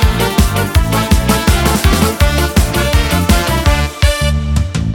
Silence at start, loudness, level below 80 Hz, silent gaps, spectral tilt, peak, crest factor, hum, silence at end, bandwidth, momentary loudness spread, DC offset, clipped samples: 0 s; -13 LUFS; -16 dBFS; none; -5 dB/octave; 0 dBFS; 12 dB; none; 0 s; 18.5 kHz; 3 LU; under 0.1%; under 0.1%